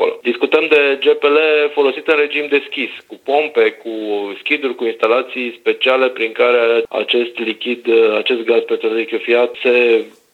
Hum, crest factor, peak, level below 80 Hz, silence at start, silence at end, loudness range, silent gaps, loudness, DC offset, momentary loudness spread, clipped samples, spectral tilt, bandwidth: none; 16 dB; 0 dBFS; -70 dBFS; 0 s; 0.25 s; 3 LU; none; -15 LUFS; under 0.1%; 9 LU; under 0.1%; -4 dB/octave; 4.5 kHz